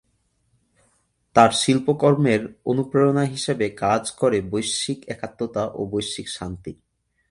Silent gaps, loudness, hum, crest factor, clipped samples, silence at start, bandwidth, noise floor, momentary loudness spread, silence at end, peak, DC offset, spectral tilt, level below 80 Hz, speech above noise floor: none; -21 LUFS; none; 22 dB; under 0.1%; 1.35 s; 11.5 kHz; -68 dBFS; 14 LU; 0.55 s; 0 dBFS; under 0.1%; -5 dB/octave; -54 dBFS; 47 dB